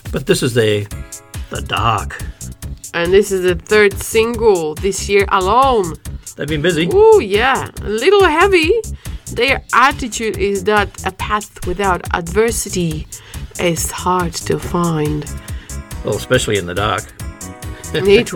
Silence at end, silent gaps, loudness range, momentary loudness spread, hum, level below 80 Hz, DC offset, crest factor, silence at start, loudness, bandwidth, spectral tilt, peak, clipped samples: 0 s; none; 6 LU; 18 LU; none; -32 dBFS; under 0.1%; 16 dB; 0.05 s; -15 LUFS; 19 kHz; -4.5 dB/octave; 0 dBFS; under 0.1%